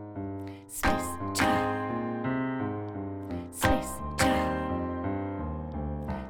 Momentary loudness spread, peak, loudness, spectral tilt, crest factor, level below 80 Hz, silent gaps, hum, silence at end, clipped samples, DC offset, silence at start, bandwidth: 11 LU; -8 dBFS; -31 LUFS; -5 dB/octave; 22 dB; -42 dBFS; none; none; 0 s; under 0.1%; under 0.1%; 0 s; over 20 kHz